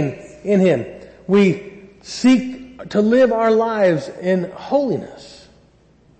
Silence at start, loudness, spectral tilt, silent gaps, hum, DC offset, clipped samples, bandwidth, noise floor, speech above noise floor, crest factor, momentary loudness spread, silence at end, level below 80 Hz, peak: 0 s; -17 LUFS; -6.5 dB/octave; none; none; under 0.1%; under 0.1%; 8.6 kHz; -53 dBFS; 36 dB; 12 dB; 17 LU; 0.9 s; -56 dBFS; -6 dBFS